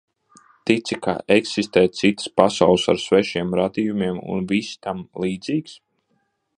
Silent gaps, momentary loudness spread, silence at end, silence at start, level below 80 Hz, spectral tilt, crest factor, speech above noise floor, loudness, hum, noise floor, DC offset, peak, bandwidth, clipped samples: none; 10 LU; 0.85 s; 0.65 s; -54 dBFS; -5 dB/octave; 20 dB; 49 dB; -21 LUFS; none; -69 dBFS; under 0.1%; 0 dBFS; 10.5 kHz; under 0.1%